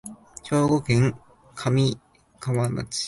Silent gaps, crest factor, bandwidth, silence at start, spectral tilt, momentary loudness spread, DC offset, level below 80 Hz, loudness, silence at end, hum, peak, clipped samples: none; 16 dB; 11.5 kHz; 0.05 s; -6 dB/octave; 19 LU; under 0.1%; -52 dBFS; -24 LUFS; 0 s; none; -8 dBFS; under 0.1%